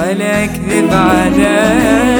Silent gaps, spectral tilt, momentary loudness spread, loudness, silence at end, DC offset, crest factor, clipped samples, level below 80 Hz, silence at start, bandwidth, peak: none; -5 dB/octave; 4 LU; -11 LUFS; 0 s; under 0.1%; 10 dB; under 0.1%; -30 dBFS; 0 s; over 20 kHz; 0 dBFS